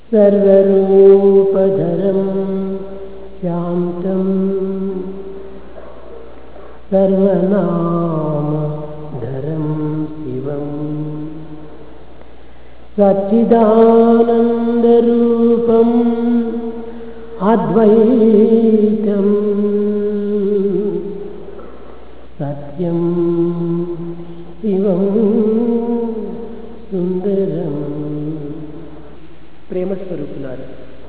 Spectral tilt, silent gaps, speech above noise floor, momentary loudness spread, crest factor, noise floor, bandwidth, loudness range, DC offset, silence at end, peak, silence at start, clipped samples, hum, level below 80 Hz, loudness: -13 dB/octave; none; 29 dB; 20 LU; 16 dB; -41 dBFS; 4 kHz; 10 LU; 3%; 0 s; 0 dBFS; 0 s; under 0.1%; none; -44 dBFS; -14 LUFS